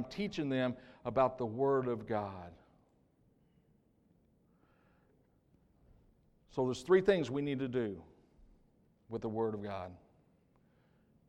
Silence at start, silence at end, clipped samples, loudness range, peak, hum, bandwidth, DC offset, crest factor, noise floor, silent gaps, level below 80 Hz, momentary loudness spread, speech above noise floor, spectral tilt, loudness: 0 s; 1.3 s; under 0.1%; 10 LU; -16 dBFS; none; 9.6 kHz; under 0.1%; 22 dB; -71 dBFS; none; -68 dBFS; 15 LU; 36 dB; -7 dB/octave; -35 LUFS